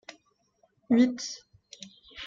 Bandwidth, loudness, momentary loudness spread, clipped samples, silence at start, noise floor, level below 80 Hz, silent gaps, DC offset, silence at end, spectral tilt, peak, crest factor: 7.6 kHz; -26 LUFS; 23 LU; under 0.1%; 0.1 s; -69 dBFS; -70 dBFS; none; under 0.1%; 0 s; -4 dB/octave; -12 dBFS; 20 dB